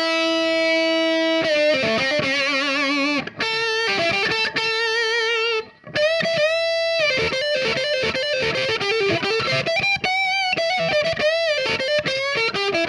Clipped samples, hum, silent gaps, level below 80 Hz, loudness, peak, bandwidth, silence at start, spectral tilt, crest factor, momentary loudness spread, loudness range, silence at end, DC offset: under 0.1%; none; none; -56 dBFS; -19 LUFS; -8 dBFS; 11 kHz; 0 s; -3 dB/octave; 14 dB; 2 LU; 1 LU; 0 s; under 0.1%